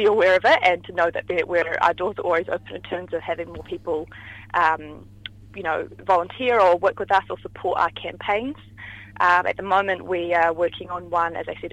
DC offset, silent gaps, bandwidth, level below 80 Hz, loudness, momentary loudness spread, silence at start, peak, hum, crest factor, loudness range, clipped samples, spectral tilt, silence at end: under 0.1%; none; 9.6 kHz; -54 dBFS; -22 LUFS; 17 LU; 0 s; -4 dBFS; 50 Hz at -45 dBFS; 18 dB; 5 LU; under 0.1%; -5 dB/octave; 0.05 s